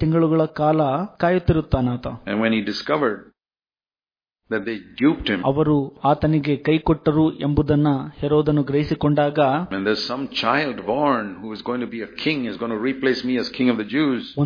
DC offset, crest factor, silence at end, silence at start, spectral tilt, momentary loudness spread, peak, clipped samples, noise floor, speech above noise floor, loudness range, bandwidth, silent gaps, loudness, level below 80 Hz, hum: under 0.1%; 16 dB; 0 s; 0 s; -8 dB/octave; 8 LU; -4 dBFS; under 0.1%; under -90 dBFS; over 70 dB; 4 LU; 5.2 kHz; none; -21 LUFS; -42 dBFS; none